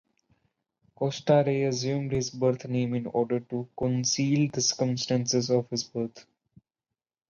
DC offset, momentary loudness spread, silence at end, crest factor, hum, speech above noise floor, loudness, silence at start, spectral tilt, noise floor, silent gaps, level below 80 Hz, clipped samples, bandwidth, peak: under 0.1%; 8 LU; 1.1 s; 18 dB; none; 63 dB; -27 LUFS; 1 s; -5 dB/octave; -90 dBFS; none; -62 dBFS; under 0.1%; 7.4 kHz; -10 dBFS